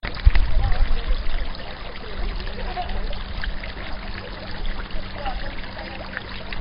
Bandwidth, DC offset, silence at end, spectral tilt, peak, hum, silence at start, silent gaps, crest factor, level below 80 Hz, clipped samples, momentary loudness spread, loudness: 5.4 kHz; under 0.1%; 0 s; -9.5 dB/octave; 0 dBFS; none; 0.05 s; none; 22 dB; -24 dBFS; under 0.1%; 9 LU; -29 LUFS